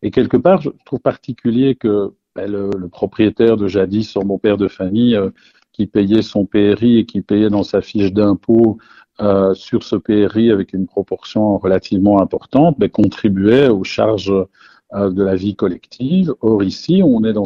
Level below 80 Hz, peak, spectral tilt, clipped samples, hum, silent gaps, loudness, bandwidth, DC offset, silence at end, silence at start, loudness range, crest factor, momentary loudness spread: -48 dBFS; 0 dBFS; -8 dB/octave; under 0.1%; none; none; -15 LUFS; 7.2 kHz; under 0.1%; 0 s; 0 s; 3 LU; 14 dB; 9 LU